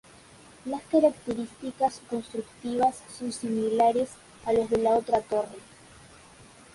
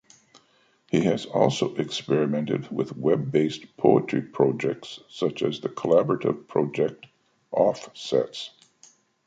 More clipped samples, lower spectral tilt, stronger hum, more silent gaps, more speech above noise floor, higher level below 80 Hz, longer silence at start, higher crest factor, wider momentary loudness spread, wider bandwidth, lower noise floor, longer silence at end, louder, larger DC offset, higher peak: neither; about the same, -5.5 dB/octave vs -6.5 dB/octave; neither; neither; second, 25 dB vs 39 dB; about the same, -62 dBFS vs -66 dBFS; second, 0.65 s vs 0.95 s; about the same, 18 dB vs 22 dB; first, 14 LU vs 9 LU; first, 11.5 kHz vs 9.2 kHz; second, -52 dBFS vs -63 dBFS; first, 1.15 s vs 0.8 s; second, -28 LUFS vs -25 LUFS; neither; second, -10 dBFS vs -4 dBFS